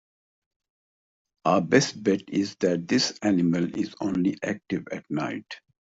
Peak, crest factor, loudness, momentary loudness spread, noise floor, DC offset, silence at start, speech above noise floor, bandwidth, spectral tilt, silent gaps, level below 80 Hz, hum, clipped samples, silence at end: -6 dBFS; 22 dB; -26 LUFS; 10 LU; under -90 dBFS; under 0.1%; 1.45 s; over 65 dB; 8 kHz; -5 dB/octave; none; -64 dBFS; none; under 0.1%; 0.4 s